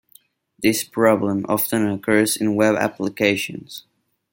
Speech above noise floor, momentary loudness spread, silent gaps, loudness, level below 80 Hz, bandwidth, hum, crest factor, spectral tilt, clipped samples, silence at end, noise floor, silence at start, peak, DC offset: 35 dB; 10 LU; none; -20 LUFS; -62 dBFS; 17 kHz; none; 18 dB; -4.5 dB/octave; under 0.1%; 0.5 s; -55 dBFS; 0.6 s; -2 dBFS; under 0.1%